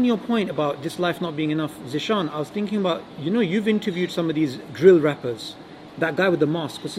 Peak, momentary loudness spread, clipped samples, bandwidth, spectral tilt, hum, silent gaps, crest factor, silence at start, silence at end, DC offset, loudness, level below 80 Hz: -2 dBFS; 10 LU; under 0.1%; 14.5 kHz; -6.5 dB/octave; none; none; 20 dB; 0 s; 0 s; under 0.1%; -23 LUFS; -64 dBFS